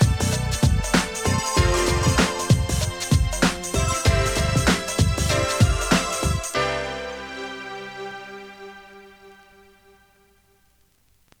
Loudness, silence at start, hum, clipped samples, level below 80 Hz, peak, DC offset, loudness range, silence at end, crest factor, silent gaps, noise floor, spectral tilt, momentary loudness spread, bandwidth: -22 LUFS; 0 s; none; under 0.1%; -30 dBFS; -4 dBFS; under 0.1%; 16 LU; 2.05 s; 18 dB; none; -61 dBFS; -4.5 dB/octave; 14 LU; 19.5 kHz